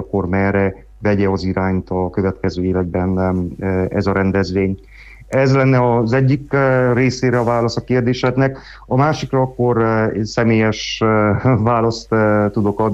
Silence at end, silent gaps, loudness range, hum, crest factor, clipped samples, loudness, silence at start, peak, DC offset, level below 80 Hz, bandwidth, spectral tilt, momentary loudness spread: 0 s; none; 3 LU; none; 12 dB; under 0.1%; -17 LUFS; 0 s; -4 dBFS; under 0.1%; -40 dBFS; 8 kHz; -7 dB/octave; 6 LU